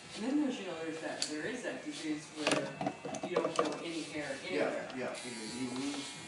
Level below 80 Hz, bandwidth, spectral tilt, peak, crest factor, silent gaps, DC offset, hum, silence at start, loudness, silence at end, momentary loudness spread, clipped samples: -76 dBFS; 11.5 kHz; -3.5 dB/octave; -14 dBFS; 24 dB; none; under 0.1%; none; 0 s; -37 LUFS; 0 s; 7 LU; under 0.1%